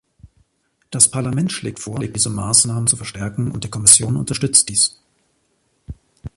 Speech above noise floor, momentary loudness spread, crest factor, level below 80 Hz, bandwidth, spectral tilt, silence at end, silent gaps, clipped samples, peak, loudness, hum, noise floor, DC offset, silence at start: 48 dB; 16 LU; 20 dB; -46 dBFS; 16 kHz; -3 dB/octave; 0.1 s; none; under 0.1%; 0 dBFS; -16 LUFS; none; -66 dBFS; under 0.1%; 0.25 s